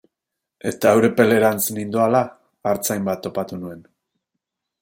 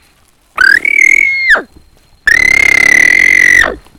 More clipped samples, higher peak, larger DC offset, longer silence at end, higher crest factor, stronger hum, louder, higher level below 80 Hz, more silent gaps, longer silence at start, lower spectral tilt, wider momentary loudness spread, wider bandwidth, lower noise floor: second, under 0.1% vs 2%; about the same, -2 dBFS vs 0 dBFS; neither; first, 1 s vs 0.2 s; first, 20 dB vs 8 dB; neither; second, -20 LUFS vs -5 LUFS; second, -64 dBFS vs -36 dBFS; neither; about the same, 0.65 s vs 0.55 s; first, -5 dB/octave vs -1 dB/octave; first, 14 LU vs 6 LU; second, 16.5 kHz vs 19.5 kHz; first, -83 dBFS vs -49 dBFS